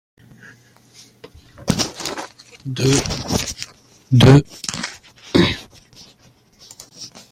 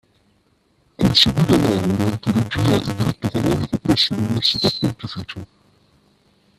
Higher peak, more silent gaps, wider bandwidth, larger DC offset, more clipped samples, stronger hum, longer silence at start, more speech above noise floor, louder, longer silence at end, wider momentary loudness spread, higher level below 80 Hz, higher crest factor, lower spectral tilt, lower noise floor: about the same, 0 dBFS vs 0 dBFS; neither; first, 16 kHz vs 14.5 kHz; neither; neither; neither; first, 1.6 s vs 1 s; second, 38 dB vs 42 dB; about the same, -18 LUFS vs -18 LUFS; second, 0.25 s vs 1.15 s; first, 24 LU vs 12 LU; about the same, -42 dBFS vs -44 dBFS; about the same, 20 dB vs 20 dB; about the same, -5 dB/octave vs -5.5 dB/octave; second, -53 dBFS vs -61 dBFS